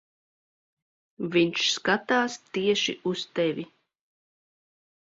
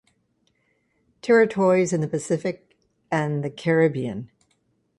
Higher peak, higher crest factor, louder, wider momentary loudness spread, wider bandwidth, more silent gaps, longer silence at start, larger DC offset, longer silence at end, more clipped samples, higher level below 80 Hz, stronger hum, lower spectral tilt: about the same, -8 dBFS vs -6 dBFS; about the same, 20 dB vs 18 dB; second, -26 LUFS vs -22 LUFS; second, 9 LU vs 13 LU; second, 8 kHz vs 11.5 kHz; neither; about the same, 1.2 s vs 1.25 s; neither; first, 1.5 s vs 0.75 s; neither; second, -70 dBFS vs -64 dBFS; neither; second, -3.5 dB/octave vs -6.5 dB/octave